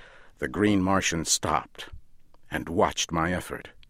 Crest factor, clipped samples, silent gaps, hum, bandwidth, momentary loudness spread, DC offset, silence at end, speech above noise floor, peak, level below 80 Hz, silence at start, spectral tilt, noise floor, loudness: 20 dB; under 0.1%; none; none; 16 kHz; 15 LU; under 0.1%; 0.1 s; 22 dB; -8 dBFS; -48 dBFS; 0 s; -3.5 dB/octave; -49 dBFS; -26 LUFS